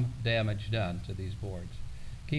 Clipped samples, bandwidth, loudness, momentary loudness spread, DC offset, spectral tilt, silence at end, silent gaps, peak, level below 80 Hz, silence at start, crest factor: under 0.1%; 11 kHz; -34 LUFS; 16 LU; under 0.1%; -6.5 dB/octave; 0 s; none; -18 dBFS; -44 dBFS; 0 s; 16 dB